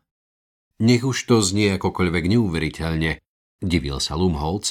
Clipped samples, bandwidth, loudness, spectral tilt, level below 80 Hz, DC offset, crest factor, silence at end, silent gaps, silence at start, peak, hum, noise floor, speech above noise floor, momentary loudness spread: under 0.1%; 16 kHz; -21 LUFS; -5 dB/octave; -38 dBFS; under 0.1%; 18 dB; 0 s; 3.27-3.59 s; 0.8 s; -4 dBFS; none; under -90 dBFS; over 70 dB; 6 LU